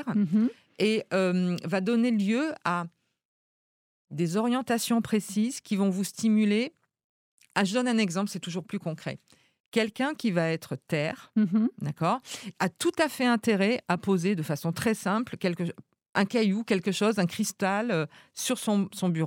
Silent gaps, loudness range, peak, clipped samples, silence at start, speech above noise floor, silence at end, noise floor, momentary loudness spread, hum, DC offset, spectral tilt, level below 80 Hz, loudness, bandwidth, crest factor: 3.25-4.05 s, 7.04-7.38 s, 9.60-9.72 s, 16.09-16.13 s; 3 LU; -10 dBFS; under 0.1%; 0 s; over 63 dB; 0 s; under -90 dBFS; 8 LU; none; under 0.1%; -5.5 dB/octave; -74 dBFS; -28 LUFS; 17 kHz; 18 dB